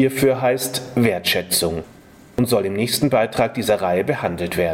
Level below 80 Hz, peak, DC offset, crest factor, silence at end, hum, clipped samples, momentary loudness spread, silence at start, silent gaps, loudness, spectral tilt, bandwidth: -48 dBFS; -2 dBFS; under 0.1%; 16 dB; 0 s; none; under 0.1%; 5 LU; 0 s; none; -19 LUFS; -4.5 dB/octave; 16.5 kHz